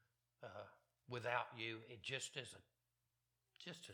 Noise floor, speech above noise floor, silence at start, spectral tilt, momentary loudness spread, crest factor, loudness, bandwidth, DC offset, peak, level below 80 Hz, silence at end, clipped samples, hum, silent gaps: -89 dBFS; 40 dB; 0.4 s; -3 dB/octave; 16 LU; 26 dB; -48 LUFS; 16 kHz; under 0.1%; -26 dBFS; -88 dBFS; 0 s; under 0.1%; none; none